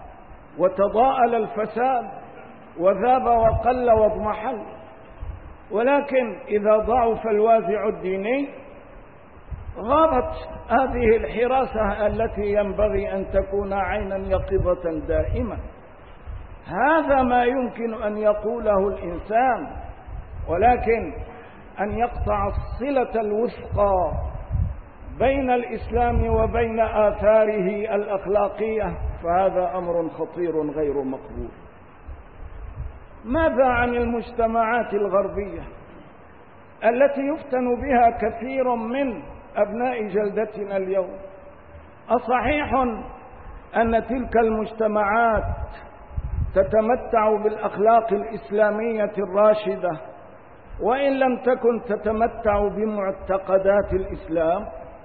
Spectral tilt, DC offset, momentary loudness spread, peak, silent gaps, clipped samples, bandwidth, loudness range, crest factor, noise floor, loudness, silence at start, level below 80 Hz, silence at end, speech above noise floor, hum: -11.5 dB/octave; 0.3%; 18 LU; -6 dBFS; none; under 0.1%; 4.6 kHz; 4 LU; 16 dB; -47 dBFS; -22 LUFS; 0 s; -36 dBFS; 0 s; 26 dB; none